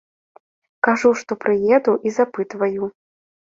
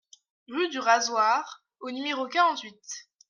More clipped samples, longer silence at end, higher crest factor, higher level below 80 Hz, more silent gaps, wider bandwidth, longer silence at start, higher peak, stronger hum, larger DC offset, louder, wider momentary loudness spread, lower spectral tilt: neither; first, 0.6 s vs 0.3 s; about the same, 20 dB vs 20 dB; first, -64 dBFS vs -84 dBFS; neither; second, 7.8 kHz vs 10 kHz; first, 0.85 s vs 0.5 s; first, 0 dBFS vs -8 dBFS; neither; neither; first, -19 LUFS vs -26 LUFS; second, 7 LU vs 17 LU; first, -5.5 dB/octave vs -0.5 dB/octave